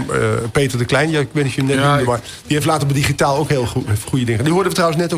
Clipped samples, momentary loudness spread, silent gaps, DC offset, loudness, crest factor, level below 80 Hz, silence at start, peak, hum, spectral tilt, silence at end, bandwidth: under 0.1%; 5 LU; none; under 0.1%; -17 LUFS; 12 dB; -42 dBFS; 0 s; -4 dBFS; none; -5.5 dB/octave; 0 s; 16 kHz